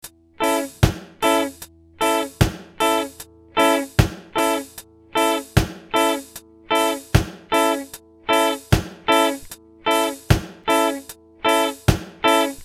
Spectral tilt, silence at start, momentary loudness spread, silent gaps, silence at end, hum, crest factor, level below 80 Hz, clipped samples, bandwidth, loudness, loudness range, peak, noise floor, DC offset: -4.5 dB/octave; 0.05 s; 14 LU; none; 0 s; none; 20 dB; -34 dBFS; under 0.1%; 16.5 kHz; -21 LUFS; 1 LU; 0 dBFS; -43 dBFS; under 0.1%